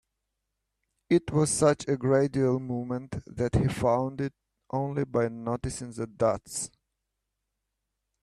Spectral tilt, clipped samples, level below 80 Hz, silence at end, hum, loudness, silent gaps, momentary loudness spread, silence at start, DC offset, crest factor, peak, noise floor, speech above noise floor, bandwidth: -6 dB/octave; under 0.1%; -52 dBFS; 1.55 s; none; -28 LUFS; none; 11 LU; 1.1 s; under 0.1%; 20 dB; -10 dBFS; -83 dBFS; 56 dB; 13 kHz